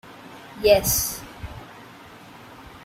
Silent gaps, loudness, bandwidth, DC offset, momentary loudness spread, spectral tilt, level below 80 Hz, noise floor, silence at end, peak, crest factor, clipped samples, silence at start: none; -20 LUFS; 16 kHz; under 0.1%; 26 LU; -2.5 dB/octave; -44 dBFS; -45 dBFS; 0.05 s; -4 dBFS; 22 dB; under 0.1%; 0.05 s